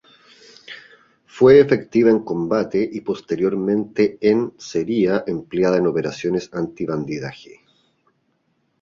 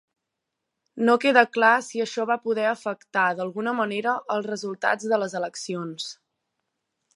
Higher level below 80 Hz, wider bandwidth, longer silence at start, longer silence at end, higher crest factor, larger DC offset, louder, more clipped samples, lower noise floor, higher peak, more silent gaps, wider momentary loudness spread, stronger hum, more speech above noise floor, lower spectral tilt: first, -56 dBFS vs -80 dBFS; second, 7.4 kHz vs 11.5 kHz; second, 0.7 s vs 0.95 s; first, 1.45 s vs 1 s; about the same, 18 dB vs 22 dB; neither; first, -19 LUFS vs -24 LUFS; neither; second, -67 dBFS vs -83 dBFS; about the same, -2 dBFS vs -2 dBFS; neither; about the same, 14 LU vs 13 LU; neither; second, 49 dB vs 59 dB; first, -7 dB/octave vs -4 dB/octave